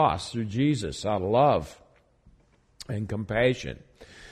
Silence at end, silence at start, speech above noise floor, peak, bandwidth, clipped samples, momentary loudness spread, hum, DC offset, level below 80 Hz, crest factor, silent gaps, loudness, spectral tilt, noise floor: 0 s; 0 s; 36 dB; -8 dBFS; 12.5 kHz; under 0.1%; 17 LU; none; under 0.1%; -50 dBFS; 18 dB; none; -26 LUFS; -6 dB/octave; -62 dBFS